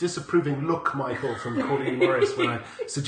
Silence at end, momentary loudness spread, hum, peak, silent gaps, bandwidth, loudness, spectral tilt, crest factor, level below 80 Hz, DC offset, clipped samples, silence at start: 0 s; 7 LU; none; -8 dBFS; none; 9.8 kHz; -26 LUFS; -5.5 dB/octave; 16 dB; -62 dBFS; under 0.1%; under 0.1%; 0 s